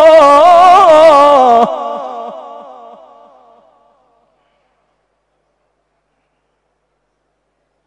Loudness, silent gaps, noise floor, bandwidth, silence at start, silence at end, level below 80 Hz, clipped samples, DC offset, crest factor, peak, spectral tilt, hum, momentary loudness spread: -6 LUFS; none; -65 dBFS; 12 kHz; 0 s; 5.45 s; -52 dBFS; 3%; under 0.1%; 12 dB; 0 dBFS; -3.5 dB/octave; 50 Hz at -70 dBFS; 23 LU